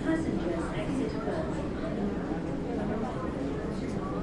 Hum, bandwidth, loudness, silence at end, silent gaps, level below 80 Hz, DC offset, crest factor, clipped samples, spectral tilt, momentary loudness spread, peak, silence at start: none; 11.5 kHz; -32 LUFS; 0 s; none; -44 dBFS; under 0.1%; 14 dB; under 0.1%; -7.5 dB/octave; 3 LU; -16 dBFS; 0 s